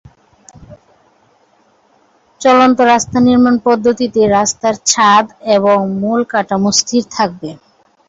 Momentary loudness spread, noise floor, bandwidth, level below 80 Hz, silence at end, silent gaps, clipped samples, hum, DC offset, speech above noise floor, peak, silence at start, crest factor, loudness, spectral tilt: 8 LU; -53 dBFS; 8 kHz; -48 dBFS; 0.55 s; none; under 0.1%; none; under 0.1%; 42 dB; 0 dBFS; 0.7 s; 14 dB; -12 LUFS; -3.5 dB/octave